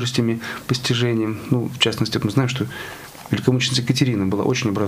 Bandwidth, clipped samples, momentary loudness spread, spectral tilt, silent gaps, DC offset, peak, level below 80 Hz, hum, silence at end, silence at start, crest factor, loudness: 15.5 kHz; under 0.1%; 8 LU; -5 dB/octave; none; under 0.1%; -2 dBFS; -54 dBFS; none; 0 s; 0 s; 18 dB; -21 LUFS